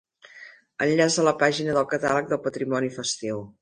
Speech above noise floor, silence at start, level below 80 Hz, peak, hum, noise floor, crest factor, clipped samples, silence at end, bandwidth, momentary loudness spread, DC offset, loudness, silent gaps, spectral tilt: 24 dB; 0.35 s; -64 dBFS; -6 dBFS; none; -48 dBFS; 18 dB; under 0.1%; 0.1 s; 10.5 kHz; 10 LU; under 0.1%; -24 LUFS; none; -4 dB/octave